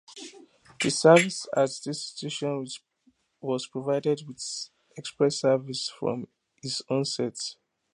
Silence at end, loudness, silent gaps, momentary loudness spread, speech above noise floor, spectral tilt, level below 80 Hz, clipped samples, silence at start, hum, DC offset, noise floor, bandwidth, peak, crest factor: 0.4 s; -27 LUFS; none; 19 LU; 41 dB; -4 dB/octave; -74 dBFS; under 0.1%; 0.1 s; none; under 0.1%; -67 dBFS; 11.5 kHz; -4 dBFS; 24 dB